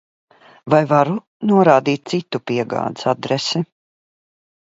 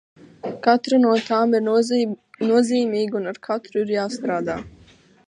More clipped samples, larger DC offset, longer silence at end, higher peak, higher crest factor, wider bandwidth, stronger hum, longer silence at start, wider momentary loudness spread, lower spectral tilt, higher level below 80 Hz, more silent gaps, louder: neither; neither; first, 1 s vs 0.6 s; about the same, 0 dBFS vs -2 dBFS; about the same, 18 dB vs 18 dB; second, 8 kHz vs 10.5 kHz; neither; first, 0.65 s vs 0.45 s; about the same, 10 LU vs 10 LU; about the same, -6 dB/octave vs -5.5 dB/octave; about the same, -64 dBFS vs -60 dBFS; first, 1.27-1.40 s vs none; first, -18 LUFS vs -21 LUFS